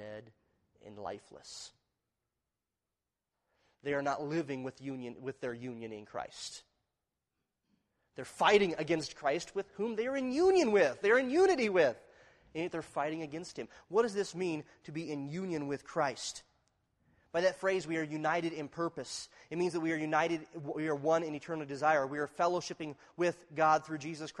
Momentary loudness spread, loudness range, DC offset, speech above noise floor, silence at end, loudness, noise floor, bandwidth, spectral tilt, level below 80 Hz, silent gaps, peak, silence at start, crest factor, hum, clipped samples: 17 LU; 13 LU; under 0.1%; over 56 dB; 0 s; -34 LUFS; under -90 dBFS; 11.5 kHz; -4.5 dB/octave; -72 dBFS; none; -12 dBFS; 0 s; 22 dB; none; under 0.1%